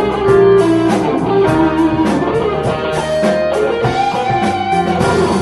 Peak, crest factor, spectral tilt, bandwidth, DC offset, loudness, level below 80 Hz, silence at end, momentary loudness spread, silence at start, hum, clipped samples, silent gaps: 0 dBFS; 12 dB; -6.5 dB/octave; 11.5 kHz; under 0.1%; -13 LUFS; -36 dBFS; 0 s; 5 LU; 0 s; none; under 0.1%; none